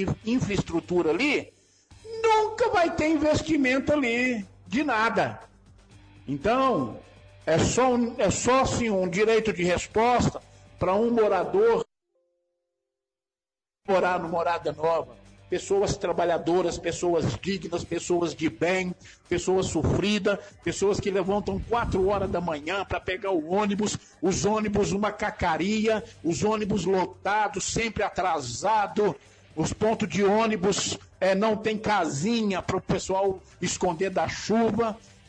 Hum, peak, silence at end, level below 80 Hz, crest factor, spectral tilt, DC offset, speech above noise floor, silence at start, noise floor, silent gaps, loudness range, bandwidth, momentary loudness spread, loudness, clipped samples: none; -14 dBFS; 0.3 s; -48 dBFS; 12 dB; -5 dB/octave; under 0.1%; over 65 dB; 0 s; under -90 dBFS; none; 3 LU; 10 kHz; 8 LU; -26 LUFS; under 0.1%